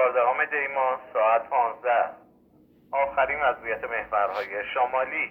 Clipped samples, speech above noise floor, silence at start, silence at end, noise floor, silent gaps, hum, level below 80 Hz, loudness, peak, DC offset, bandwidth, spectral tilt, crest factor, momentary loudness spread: under 0.1%; 33 dB; 0 s; 0 s; -58 dBFS; none; none; -62 dBFS; -25 LUFS; -10 dBFS; under 0.1%; 5.8 kHz; -5.5 dB/octave; 16 dB; 7 LU